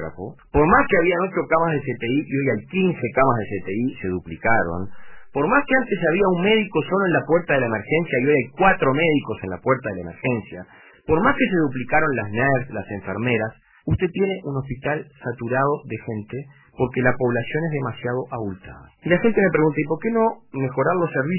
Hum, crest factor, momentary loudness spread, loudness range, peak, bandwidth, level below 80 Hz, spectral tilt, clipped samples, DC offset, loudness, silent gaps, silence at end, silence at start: none; 18 dB; 12 LU; 5 LU; -4 dBFS; 3.1 kHz; -44 dBFS; -11 dB/octave; under 0.1%; under 0.1%; -21 LUFS; none; 0 s; 0 s